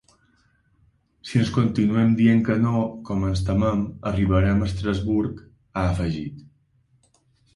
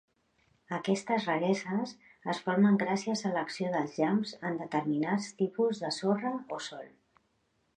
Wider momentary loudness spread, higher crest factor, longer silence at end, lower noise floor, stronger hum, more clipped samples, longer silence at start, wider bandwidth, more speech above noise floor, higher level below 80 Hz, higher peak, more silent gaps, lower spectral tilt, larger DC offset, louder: about the same, 12 LU vs 12 LU; about the same, 16 dB vs 18 dB; first, 1.15 s vs 0.9 s; second, -63 dBFS vs -75 dBFS; neither; neither; first, 1.25 s vs 0.7 s; first, 11.5 kHz vs 9.8 kHz; about the same, 42 dB vs 44 dB; first, -38 dBFS vs -78 dBFS; first, -6 dBFS vs -14 dBFS; neither; first, -8 dB/octave vs -5.5 dB/octave; neither; first, -22 LUFS vs -31 LUFS